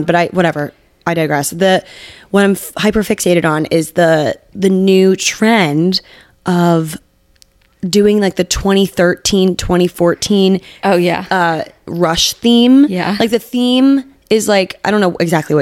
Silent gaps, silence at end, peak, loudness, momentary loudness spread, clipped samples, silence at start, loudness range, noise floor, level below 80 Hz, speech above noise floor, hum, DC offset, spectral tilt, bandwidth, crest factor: none; 0 s; 0 dBFS; -13 LUFS; 7 LU; under 0.1%; 0 s; 3 LU; -51 dBFS; -38 dBFS; 38 dB; none; under 0.1%; -5 dB/octave; 16.5 kHz; 12 dB